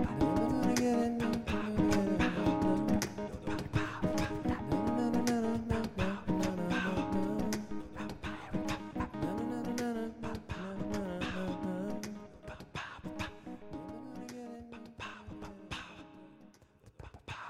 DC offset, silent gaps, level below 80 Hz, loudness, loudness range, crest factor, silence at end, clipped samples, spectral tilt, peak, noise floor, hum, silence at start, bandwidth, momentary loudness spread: under 0.1%; none; -52 dBFS; -35 LUFS; 13 LU; 20 dB; 0 s; under 0.1%; -6 dB/octave; -16 dBFS; -61 dBFS; none; 0 s; 15 kHz; 16 LU